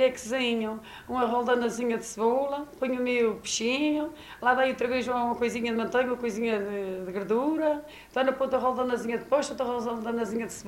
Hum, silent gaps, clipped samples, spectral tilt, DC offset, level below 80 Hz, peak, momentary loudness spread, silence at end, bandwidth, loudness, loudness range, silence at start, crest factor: none; none; under 0.1%; -3.5 dB/octave; under 0.1%; -60 dBFS; -10 dBFS; 7 LU; 0 s; 16 kHz; -28 LUFS; 1 LU; 0 s; 18 dB